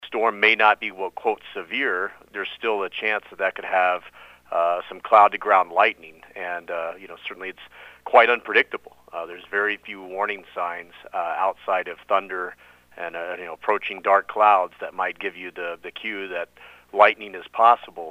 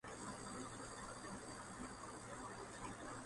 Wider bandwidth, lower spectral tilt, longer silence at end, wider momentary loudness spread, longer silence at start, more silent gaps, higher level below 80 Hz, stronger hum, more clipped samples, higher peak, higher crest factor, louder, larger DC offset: first, 15 kHz vs 11.5 kHz; about the same, -4 dB/octave vs -3.5 dB/octave; about the same, 0 s vs 0 s; first, 17 LU vs 2 LU; about the same, 0 s vs 0.05 s; neither; about the same, -68 dBFS vs -66 dBFS; neither; neither; first, 0 dBFS vs -36 dBFS; first, 22 dB vs 14 dB; first, -22 LUFS vs -51 LUFS; neither